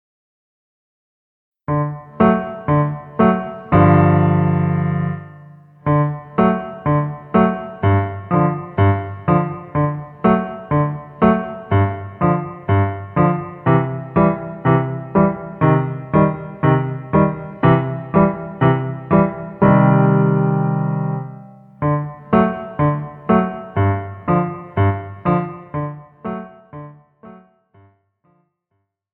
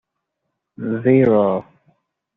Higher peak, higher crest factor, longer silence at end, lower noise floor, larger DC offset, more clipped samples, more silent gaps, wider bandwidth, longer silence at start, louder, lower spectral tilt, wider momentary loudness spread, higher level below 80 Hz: about the same, -2 dBFS vs -4 dBFS; about the same, 16 dB vs 16 dB; first, 1.8 s vs 0.75 s; second, -71 dBFS vs -77 dBFS; neither; neither; neither; about the same, 3.9 kHz vs 4 kHz; first, 1.7 s vs 0.8 s; about the same, -18 LUFS vs -17 LUFS; first, -12.5 dB/octave vs -8.5 dB/octave; second, 9 LU vs 13 LU; first, -44 dBFS vs -60 dBFS